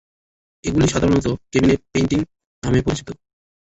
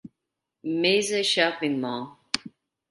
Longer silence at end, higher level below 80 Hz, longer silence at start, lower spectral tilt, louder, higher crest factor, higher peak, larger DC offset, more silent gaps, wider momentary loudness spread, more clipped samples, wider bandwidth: about the same, 0.5 s vs 0.45 s; first, -38 dBFS vs -72 dBFS; first, 0.65 s vs 0.05 s; first, -6 dB/octave vs -3 dB/octave; first, -20 LUFS vs -25 LUFS; second, 16 dB vs 24 dB; about the same, -4 dBFS vs -4 dBFS; neither; first, 2.46-2.62 s vs none; first, 13 LU vs 10 LU; neither; second, 8.2 kHz vs 11.5 kHz